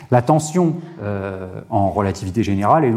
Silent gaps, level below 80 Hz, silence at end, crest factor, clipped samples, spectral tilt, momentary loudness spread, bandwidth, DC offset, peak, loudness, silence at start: none; -50 dBFS; 0 s; 16 dB; under 0.1%; -7 dB/octave; 11 LU; 15 kHz; under 0.1%; -2 dBFS; -19 LUFS; 0 s